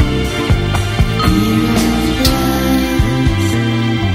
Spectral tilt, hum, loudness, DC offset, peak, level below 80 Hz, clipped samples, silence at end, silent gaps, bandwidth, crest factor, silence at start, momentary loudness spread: -5.5 dB/octave; none; -14 LUFS; under 0.1%; 0 dBFS; -22 dBFS; under 0.1%; 0 s; none; 16 kHz; 14 dB; 0 s; 2 LU